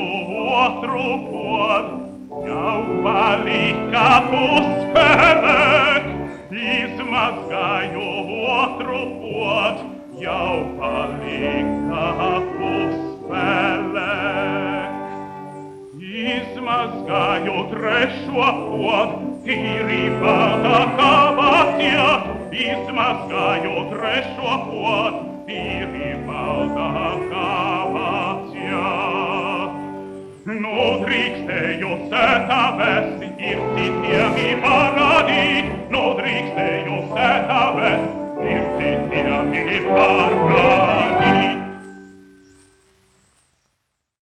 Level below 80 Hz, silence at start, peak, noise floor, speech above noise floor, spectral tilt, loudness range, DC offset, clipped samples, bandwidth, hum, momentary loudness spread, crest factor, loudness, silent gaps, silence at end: -46 dBFS; 0 s; 0 dBFS; -73 dBFS; 55 dB; -5.5 dB/octave; 7 LU; under 0.1%; under 0.1%; 11.5 kHz; none; 12 LU; 18 dB; -18 LUFS; none; 2.05 s